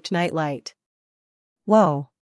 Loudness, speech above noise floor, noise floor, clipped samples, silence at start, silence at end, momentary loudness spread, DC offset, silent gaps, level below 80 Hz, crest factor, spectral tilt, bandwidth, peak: -21 LUFS; over 69 dB; under -90 dBFS; under 0.1%; 0.05 s; 0.35 s; 19 LU; under 0.1%; 0.86-1.56 s; -74 dBFS; 18 dB; -6.5 dB/octave; 12 kHz; -4 dBFS